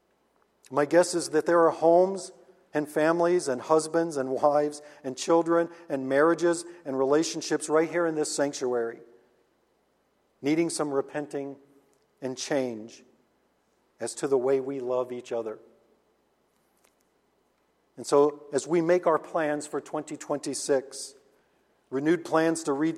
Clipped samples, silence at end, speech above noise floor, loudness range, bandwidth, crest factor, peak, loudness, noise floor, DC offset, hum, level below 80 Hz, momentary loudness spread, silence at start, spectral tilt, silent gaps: under 0.1%; 0 s; 44 dB; 8 LU; 14 kHz; 20 dB; -8 dBFS; -27 LUFS; -70 dBFS; under 0.1%; none; -78 dBFS; 13 LU; 0.7 s; -4.5 dB/octave; none